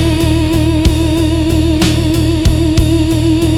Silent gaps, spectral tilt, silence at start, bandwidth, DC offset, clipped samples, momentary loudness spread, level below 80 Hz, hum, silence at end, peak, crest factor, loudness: none; -6 dB/octave; 0 s; 16.5 kHz; under 0.1%; under 0.1%; 1 LU; -20 dBFS; none; 0 s; 0 dBFS; 10 dB; -12 LUFS